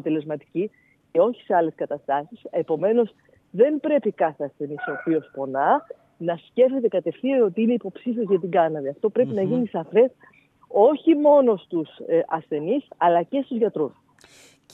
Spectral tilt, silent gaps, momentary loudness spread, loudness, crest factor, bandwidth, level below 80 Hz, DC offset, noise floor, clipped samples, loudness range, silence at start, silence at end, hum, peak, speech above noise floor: -8.5 dB/octave; none; 11 LU; -23 LUFS; 18 dB; 7.4 kHz; -78 dBFS; under 0.1%; -53 dBFS; under 0.1%; 4 LU; 0.05 s; 0.85 s; none; -4 dBFS; 31 dB